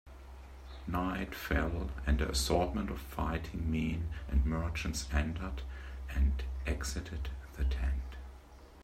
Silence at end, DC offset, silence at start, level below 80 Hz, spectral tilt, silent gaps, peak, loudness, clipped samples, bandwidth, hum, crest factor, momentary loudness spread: 0 s; under 0.1%; 0.05 s; -38 dBFS; -5.5 dB/octave; none; -16 dBFS; -36 LUFS; under 0.1%; 15.5 kHz; none; 20 dB; 15 LU